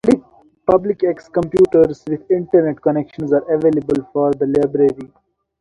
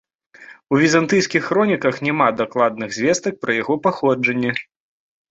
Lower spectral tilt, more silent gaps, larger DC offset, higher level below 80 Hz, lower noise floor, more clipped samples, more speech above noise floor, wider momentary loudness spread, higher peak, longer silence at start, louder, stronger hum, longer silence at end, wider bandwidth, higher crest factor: first, -8.5 dB/octave vs -5 dB/octave; neither; neither; first, -50 dBFS vs -60 dBFS; about the same, -43 dBFS vs -45 dBFS; neither; about the same, 27 dB vs 27 dB; about the same, 7 LU vs 6 LU; about the same, 0 dBFS vs -2 dBFS; second, 0.05 s vs 0.4 s; about the same, -17 LUFS vs -18 LUFS; neither; second, 0.55 s vs 0.7 s; first, 11 kHz vs 8.2 kHz; about the same, 16 dB vs 18 dB